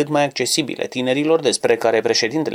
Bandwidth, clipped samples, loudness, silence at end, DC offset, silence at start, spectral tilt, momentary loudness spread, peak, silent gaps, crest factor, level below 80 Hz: 18 kHz; under 0.1%; -18 LUFS; 0 s; under 0.1%; 0 s; -3.5 dB/octave; 4 LU; -4 dBFS; none; 14 dB; -64 dBFS